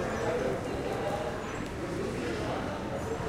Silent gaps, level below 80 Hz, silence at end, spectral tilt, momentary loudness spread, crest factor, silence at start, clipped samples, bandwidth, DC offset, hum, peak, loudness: none; -48 dBFS; 0 s; -5.5 dB/octave; 5 LU; 14 dB; 0 s; under 0.1%; 16 kHz; under 0.1%; none; -20 dBFS; -34 LUFS